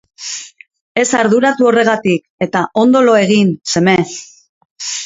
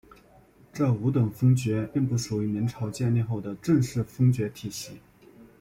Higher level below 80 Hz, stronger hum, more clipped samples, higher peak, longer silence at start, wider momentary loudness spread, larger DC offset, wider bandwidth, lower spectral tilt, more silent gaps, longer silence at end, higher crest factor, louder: about the same, -56 dBFS vs -56 dBFS; neither; neither; first, 0 dBFS vs -12 dBFS; second, 0.2 s vs 0.75 s; first, 14 LU vs 11 LU; neither; second, 8 kHz vs 16 kHz; second, -4.5 dB/octave vs -7 dB/octave; first, 0.81-0.95 s, 2.30-2.38 s, 4.49-4.76 s vs none; second, 0 s vs 0.2 s; about the same, 14 dB vs 16 dB; first, -13 LUFS vs -26 LUFS